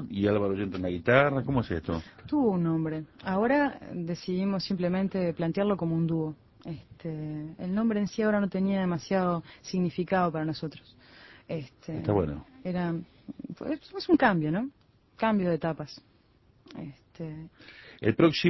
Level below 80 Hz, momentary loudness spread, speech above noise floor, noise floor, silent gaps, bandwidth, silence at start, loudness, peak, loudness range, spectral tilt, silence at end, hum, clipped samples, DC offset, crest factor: -54 dBFS; 18 LU; 34 dB; -63 dBFS; none; 6.2 kHz; 0 s; -29 LUFS; -6 dBFS; 5 LU; -7.5 dB/octave; 0 s; none; under 0.1%; under 0.1%; 24 dB